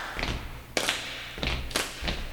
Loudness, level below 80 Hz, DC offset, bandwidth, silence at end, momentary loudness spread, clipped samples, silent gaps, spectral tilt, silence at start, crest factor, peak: -31 LUFS; -38 dBFS; under 0.1%; 19.5 kHz; 0 s; 6 LU; under 0.1%; none; -2.5 dB/octave; 0 s; 24 dB; -8 dBFS